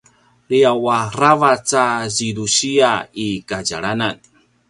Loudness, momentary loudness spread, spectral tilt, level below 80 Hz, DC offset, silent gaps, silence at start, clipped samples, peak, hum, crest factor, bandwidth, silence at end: -17 LUFS; 9 LU; -3.5 dB/octave; -54 dBFS; under 0.1%; none; 0.5 s; under 0.1%; 0 dBFS; none; 18 dB; 11.5 kHz; 0.55 s